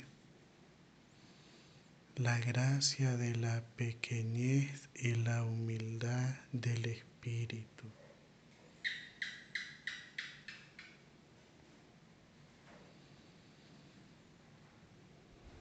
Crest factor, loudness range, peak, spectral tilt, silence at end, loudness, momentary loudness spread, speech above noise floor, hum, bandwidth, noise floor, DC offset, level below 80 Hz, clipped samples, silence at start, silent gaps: 22 dB; 15 LU; -20 dBFS; -5 dB/octave; 0 s; -39 LUFS; 26 LU; 27 dB; none; 9 kHz; -64 dBFS; under 0.1%; -76 dBFS; under 0.1%; 0 s; none